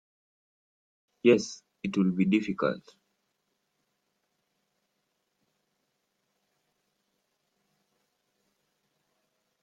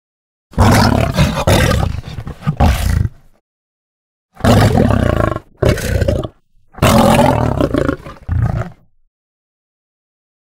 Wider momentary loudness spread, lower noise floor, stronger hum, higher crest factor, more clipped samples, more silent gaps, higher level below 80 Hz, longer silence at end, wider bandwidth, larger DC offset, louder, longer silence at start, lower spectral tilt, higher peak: first, 15 LU vs 12 LU; first, -79 dBFS vs -45 dBFS; neither; first, 24 dB vs 14 dB; neither; second, none vs 3.41-4.29 s; second, -72 dBFS vs -24 dBFS; first, 6.85 s vs 1.7 s; second, 7.8 kHz vs 16.5 kHz; neither; second, -27 LUFS vs -14 LUFS; first, 1.25 s vs 0.55 s; about the same, -6.5 dB/octave vs -6 dB/octave; second, -10 dBFS vs 0 dBFS